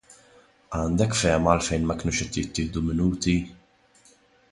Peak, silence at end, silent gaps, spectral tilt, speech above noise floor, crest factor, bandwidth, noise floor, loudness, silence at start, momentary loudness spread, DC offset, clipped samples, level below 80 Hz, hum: -4 dBFS; 0.95 s; none; -5 dB/octave; 34 dB; 22 dB; 11.5 kHz; -58 dBFS; -25 LUFS; 0.7 s; 7 LU; under 0.1%; under 0.1%; -40 dBFS; none